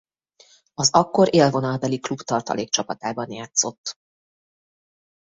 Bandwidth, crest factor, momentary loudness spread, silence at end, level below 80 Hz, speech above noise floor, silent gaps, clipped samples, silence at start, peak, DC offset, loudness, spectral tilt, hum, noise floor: 8 kHz; 22 dB; 13 LU; 1.4 s; -62 dBFS; 35 dB; 3.78-3.84 s; under 0.1%; 0.8 s; -2 dBFS; under 0.1%; -21 LUFS; -4 dB/octave; none; -56 dBFS